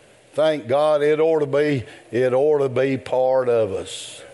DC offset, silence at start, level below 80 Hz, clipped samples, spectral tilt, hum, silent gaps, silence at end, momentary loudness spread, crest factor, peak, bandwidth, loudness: under 0.1%; 0.35 s; -66 dBFS; under 0.1%; -6 dB/octave; none; none; 0 s; 10 LU; 12 dB; -8 dBFS; 11.5 kHz; -20 LUFS